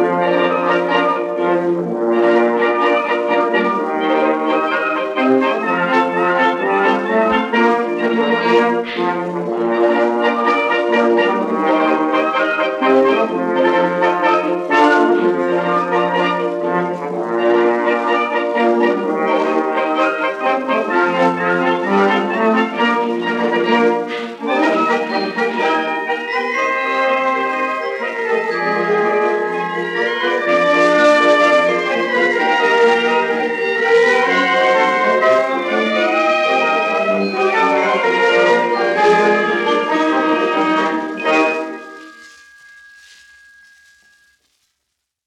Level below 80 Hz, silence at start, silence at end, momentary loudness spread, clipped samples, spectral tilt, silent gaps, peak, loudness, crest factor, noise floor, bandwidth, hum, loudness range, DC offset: -66 dBFS; 0 s; 3 s; 6 LU; under 0.1%; -5 dB/octave; none; 0 dBFS; -15 LUFS; 14 dB; -74 dBFS; 10.5 kHz; none; 4 LU; under 0.1%